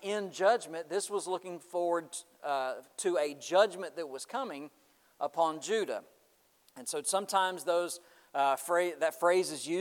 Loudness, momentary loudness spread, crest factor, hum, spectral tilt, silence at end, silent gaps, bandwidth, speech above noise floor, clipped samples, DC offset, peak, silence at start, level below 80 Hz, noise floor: -32 LUFS; 12 LU; 20 dB; none; -2.5 dB/octave; 0 s; none; 18.5 kHz; 36 dB; under 0.1%; under 0.1%; -14 dBFS; 0 s; under -90 dBFS; -69 dBFS